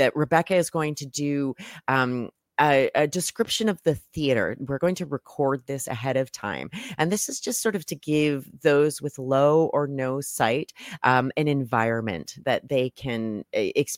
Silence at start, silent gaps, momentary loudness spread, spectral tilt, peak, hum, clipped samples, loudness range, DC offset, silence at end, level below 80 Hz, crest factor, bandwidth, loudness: 0 s; none; 10 LU; -4.5 dB/octave; -4 dBFS; none; under 0.1%; 4 LU; under 0.1%; 0 s; -60 dBFS; 20 dB; 16.5 kHz; -25 LUFS